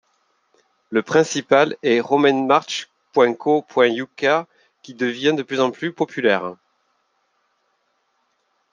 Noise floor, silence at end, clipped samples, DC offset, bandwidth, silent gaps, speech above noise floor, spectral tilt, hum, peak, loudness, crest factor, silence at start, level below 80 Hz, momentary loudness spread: -68 dBFS; 2.2 s; under 0.1%; under 0.1%; 9.6 kHz; none; 50 dB; -4.5 dB/octave; none; -2 dBFS; -19 LUFS; 20 dB; 0.9 s; -72 dBFS; 8 LU